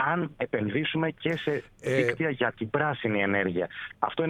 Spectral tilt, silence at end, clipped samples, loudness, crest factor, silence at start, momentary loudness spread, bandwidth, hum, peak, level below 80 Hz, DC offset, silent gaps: -6.5 dB/octave; 0 s; under 0.1%; -28 LUFS; 20 dB; 0 s; 6 LU; 12 kHz; none; -8 dBFS; -62 dBFS; under 0.1%; none